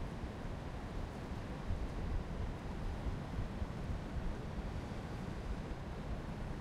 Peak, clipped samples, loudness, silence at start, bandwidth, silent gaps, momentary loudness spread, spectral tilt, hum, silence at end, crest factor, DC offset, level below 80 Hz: -28 dBFS; under 0.1%; -44 LUFS; 0 s; 12.5 kHz; none; 3 LU; -7 dB/octave; none; 0 s; 14 dB; under 0.1%; -44 dBFS